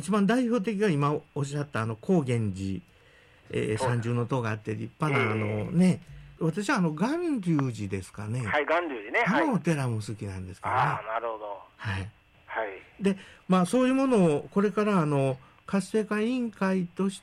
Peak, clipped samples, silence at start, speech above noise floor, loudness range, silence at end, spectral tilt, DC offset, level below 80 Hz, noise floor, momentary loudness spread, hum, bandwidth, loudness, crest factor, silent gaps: -16 dBFS; under 0.1%; 0 s; 30 dB; 4 LU; 0.05 s; -7 dB/octave; under 0.1%; -62 dBFS; -57 dBFS; 11 LU; none; 12 kHz; -28 LUFS; 12 dB; none